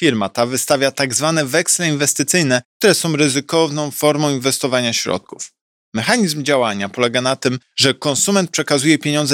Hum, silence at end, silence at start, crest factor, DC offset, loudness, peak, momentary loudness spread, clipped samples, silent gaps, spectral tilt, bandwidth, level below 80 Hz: none; 0 s; 0 s; 16 dB; under 0.1%; -16 LUFS; 0 dBFS; 6 LU; under 0.1%; 2.65-2.80 s, 5.61-5.92 s; -3.5 dB/octave; 18.5 kHz; -64 dBFS